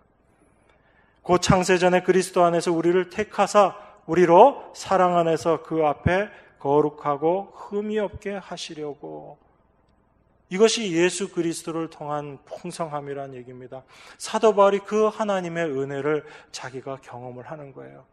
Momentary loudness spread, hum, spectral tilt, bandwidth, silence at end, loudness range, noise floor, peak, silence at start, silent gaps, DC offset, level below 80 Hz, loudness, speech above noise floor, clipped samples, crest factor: 19 LU; none; -5 dB/octave; 13 kHz; 0.2 s; 9 LU; -62 dBFS; -2 dBFS; 1.25 s; none; under 0.1%; -52 dBFS; -22 LUFS; 40 dB; under 0.1%; 22 dB